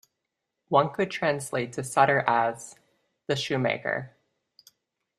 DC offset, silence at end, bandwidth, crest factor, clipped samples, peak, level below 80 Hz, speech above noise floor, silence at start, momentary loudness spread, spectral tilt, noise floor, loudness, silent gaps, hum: under 0.1%; 1.1 s; 14 kHz; 24 dB; under 0.1%; -4 dBFS; -70 dBFS; 57 dB; 0.7 s; 16 LU; -4.5 dB/octave; -83 dBFS; -26 LUFS; none; none